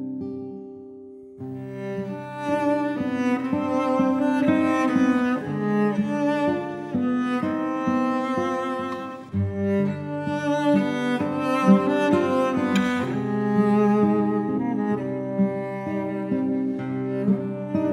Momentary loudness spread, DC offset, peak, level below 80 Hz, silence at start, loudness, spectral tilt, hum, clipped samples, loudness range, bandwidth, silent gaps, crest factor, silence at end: 11 LU; under 0.1%; -4 dBFS; -64 dBFS; 0 s; -24 LUFS; -7.5 dB/octave; none; under 0.1%; 4 LU; 11.5 kHz; none; 20 dB; 0 s